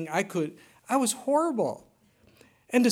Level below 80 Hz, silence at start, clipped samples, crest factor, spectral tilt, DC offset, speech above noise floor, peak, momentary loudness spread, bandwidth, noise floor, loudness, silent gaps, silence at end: -76 dBFS; 0 s; under 0.1%; 18 dB; -4 dB/octave; under 0.1%; 34 dB; -10 dBFS; 8 LU; 17 kHz; -62 dBFS; -28 LUFS; none; 0 s